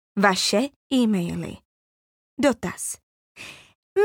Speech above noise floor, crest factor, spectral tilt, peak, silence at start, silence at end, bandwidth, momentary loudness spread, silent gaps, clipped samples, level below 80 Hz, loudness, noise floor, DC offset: over 67 dB; 20 dB; -4 dB/octave; -4 dBFS; 0.15 s; 0 s; 18 kHz; 21 LU; 0.76-0.90 s, 1.65-2.37 s, 3.03-3.35 s, 3.75-3.96 s; under 0.1%; -58 dBFS; -23 LUFS; under -90 dBFS; under 0.1%